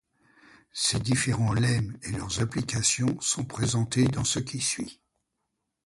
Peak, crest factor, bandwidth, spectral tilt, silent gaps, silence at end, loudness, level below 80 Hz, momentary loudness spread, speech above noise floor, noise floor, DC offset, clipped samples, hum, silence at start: -10 dBFS; 18 dB; 11.5 kHz; -4 dB/octave; none; 0.95 s; -27 LUFS; -50 dBFS; 8 LU; 54 dB; -81 dBFS; under 0.1%; under 0.1%; none; 0.75 s